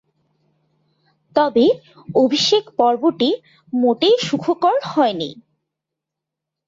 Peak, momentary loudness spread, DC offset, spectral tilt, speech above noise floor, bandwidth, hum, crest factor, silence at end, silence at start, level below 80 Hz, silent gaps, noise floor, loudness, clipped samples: -2 dBFS; 10 LU; under 0.1%; -4.5 dB/octave; 66 dB; 7.8 kHz; none; 16 dB; 1.35 s; 1.35 s; -64 dBFS; none; -83 dBFS; -18 LUFS; under 0.1%